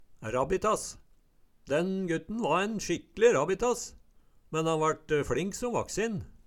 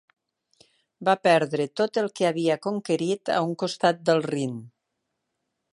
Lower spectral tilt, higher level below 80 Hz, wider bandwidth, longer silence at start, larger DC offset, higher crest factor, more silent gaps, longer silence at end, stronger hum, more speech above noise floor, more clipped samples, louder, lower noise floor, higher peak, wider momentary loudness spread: about the same, -5 dB/octave vs -5.5 dB/octave; first, -52 dBFS vs -76 dBFS; first, 15 kHz vs 11.5 kHz; second, 0 s vs 1 s; neither; about the same, 20 dB vs 20 dB; neither; second, 0.15 s vs 1.05 s; neither; second, 33 dB vs 56 dB; neither; second, -30 LUFS vs -24 LUFS; second, -62 dBFS vs -80 dBFS; second, -10 dBFS vs -6 dBFS; about the same, 9 LU vs 8 LU